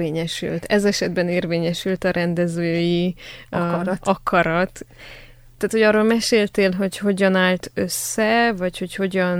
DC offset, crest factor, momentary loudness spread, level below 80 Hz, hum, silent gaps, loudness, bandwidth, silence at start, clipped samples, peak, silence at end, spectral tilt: under 0.1%; 16 dB; 9 LU; -48 dBFS; none; none; -20 LUFS; 20 kHz; 0 s; under 0.1%; -4 dBFS; 0 s; -5 dB/octave